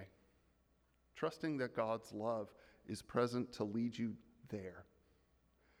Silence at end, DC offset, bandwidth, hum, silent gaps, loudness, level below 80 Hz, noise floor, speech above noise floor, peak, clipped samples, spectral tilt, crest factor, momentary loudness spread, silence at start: 0.95 s; under 0.1%; 14.5 kHz; none; none; -42 LUFS; -74 dBFS; -76 dBFS; 35 dB; -22 dBFS; under 0.1%; -6.5 dB/octave; 20 dB; 17 LU; 0 s